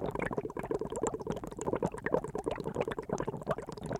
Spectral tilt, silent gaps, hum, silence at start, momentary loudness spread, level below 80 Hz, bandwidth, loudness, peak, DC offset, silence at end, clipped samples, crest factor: -6 dB/octave; none; none; 0 s; 4 LU; -54 dBFS; 16 kHz; -36 LUFS; -14 dBFS; under 0.1%; 0 s; under 0.1%; 22 dB